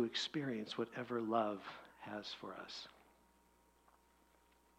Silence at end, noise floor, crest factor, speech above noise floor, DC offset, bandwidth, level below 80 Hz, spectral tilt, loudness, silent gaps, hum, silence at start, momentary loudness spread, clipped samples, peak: 1.8 s; -72 dBFS; 24 dB; 29 dB; under 0.1%; 15.5 kHz; -80 dBFS; -4.5 dB/octave; -43 LUFS; none; 60 Hz at -80 dBFS; 0 s; 13 LU; under 0.1%; -22 dBFS